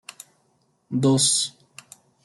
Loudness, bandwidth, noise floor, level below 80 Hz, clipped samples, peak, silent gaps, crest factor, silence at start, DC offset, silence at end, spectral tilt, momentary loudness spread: -21 LUFS; 12.5 kHz; -67 dBFS; -66 dBFS; under 0.1%; -8 dBFS; none; 18 dB; 0.9 s; under 0.1%; 0.75 s; -4 dB/octave; 14 LU